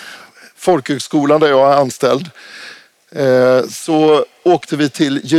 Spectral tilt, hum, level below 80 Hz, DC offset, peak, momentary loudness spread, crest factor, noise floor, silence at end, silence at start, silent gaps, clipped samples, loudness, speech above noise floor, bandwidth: -5.5 dB/octave; none; -60 dBFS; under 0.1%; -2 dBFS; 21 LU; 12 dB; -39 dBFS; 0 s; 0 s; none; under 0.1%; -14 LUFS; 26 dB; 15 kHz